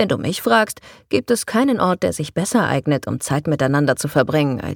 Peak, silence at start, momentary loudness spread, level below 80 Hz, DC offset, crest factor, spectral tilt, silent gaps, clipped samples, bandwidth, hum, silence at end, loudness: -2 dBFS; 0 s; 6 LU; -52 dBFS; under 0.1%; 18 dB; -5 dB/octave; none; under 0.1%; 18 kHz; none; 0 s; -19 LUFS